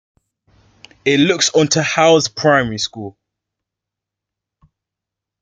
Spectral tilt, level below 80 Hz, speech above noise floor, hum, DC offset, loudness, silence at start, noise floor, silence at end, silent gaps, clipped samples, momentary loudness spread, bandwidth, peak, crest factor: -3.5 dB/octave; -54 dBFS; 69 dB; none; under 0.1%; -14 LUFS; 1.05 s; -84 dBFS; 2.3 s; none; under 0.1%; 11 LU; 9.6 kHz; 0 dBFS; 18 dB